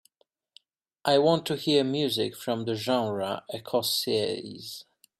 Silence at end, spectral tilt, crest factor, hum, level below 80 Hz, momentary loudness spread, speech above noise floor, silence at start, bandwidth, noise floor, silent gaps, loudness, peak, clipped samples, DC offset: 0.35 s; -4.5 dB/octave; 20 dB; none; -72 dBFS; 13 LU; 45 dB; 1.05 s; 15.5 kHz; -72 dBFS; none; -27 LUFS; -8 dBFS; under 0.1%; under 0.1%